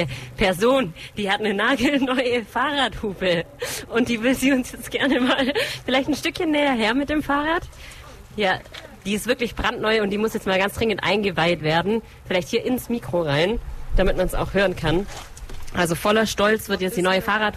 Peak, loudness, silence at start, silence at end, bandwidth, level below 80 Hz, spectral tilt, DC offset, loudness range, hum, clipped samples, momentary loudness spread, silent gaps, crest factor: -6 dBFS; -22 LUFS; 0 s; 0 s; 14.5 kHz; -36 dBFS; -4.5 dB/octave; under 0.1%; 2 LU; none; under 0.1%; 9 LU; none; 14 dB